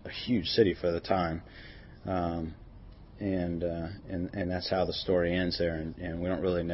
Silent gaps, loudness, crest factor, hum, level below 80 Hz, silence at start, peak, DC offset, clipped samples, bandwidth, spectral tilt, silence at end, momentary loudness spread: none; -31 LUFS; 20 dB; none; -50 dBFS; 0 s; -12 dBFS; under 0.1%; under 0.1%; 6 kHz; -9 dB/octave; 0 s; 14 LU